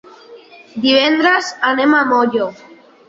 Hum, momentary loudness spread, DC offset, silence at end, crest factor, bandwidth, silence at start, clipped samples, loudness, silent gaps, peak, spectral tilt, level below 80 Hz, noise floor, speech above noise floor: none; 9 LU; under 0.1%; 0.55 s; 14 dB; 7.8 kHz; 0.3 s; under 0.1%; -14 LUFS; none; -2 dBFS; -3.5 dB/octave; -62 dBFS; -40 dBFS; 26 dB